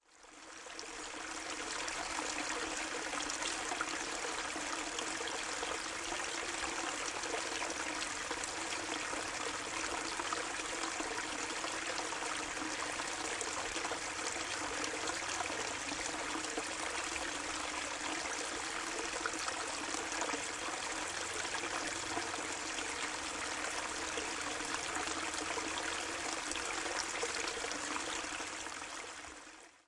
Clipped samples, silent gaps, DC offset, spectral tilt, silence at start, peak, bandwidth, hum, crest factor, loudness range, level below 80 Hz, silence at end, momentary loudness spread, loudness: under 0.1%; none; under 0.1%; -0.5 dB/octave; 0.1 s; -18 dBFS; 11.5 kHz; none; 22 dB; 1 LU; -64 dBFS; 0.1 s; 2 LU; -38 LUFS